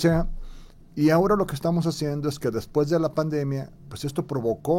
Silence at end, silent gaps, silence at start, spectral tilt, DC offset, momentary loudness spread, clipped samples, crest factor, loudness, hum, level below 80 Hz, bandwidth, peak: 0 s; none; 0 s; -7 dB/octave; under 0.1%; 13 LU; under 0.1%; 14 dB; -25 LUFS; none; -40 dBFS; 16.5 kHz; -10 dBFS